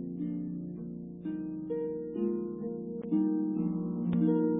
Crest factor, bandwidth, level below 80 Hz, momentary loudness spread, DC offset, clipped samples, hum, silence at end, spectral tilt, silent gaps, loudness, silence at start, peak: 16 dB; 3.7 kHz; -64 dBFS; 10 LU; under 0.1%; under 0.1%; none; 0 s; -13 dB/octave; none; -34 LUFS; 0 s; -18 dBFS